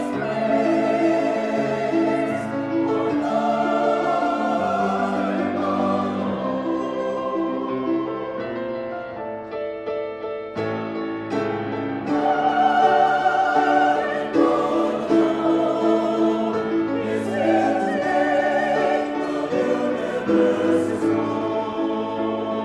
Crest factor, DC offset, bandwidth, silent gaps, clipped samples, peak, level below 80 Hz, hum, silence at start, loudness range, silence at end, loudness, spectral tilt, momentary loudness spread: 16 dB; under 0.1%; 10.5 kHz; none; under 0.1%; -6 dBFS; -60 dBFS; none; 0 s; 8 LU; 0 s; -22 LUFS; -6.5 dB/octave; 9 LU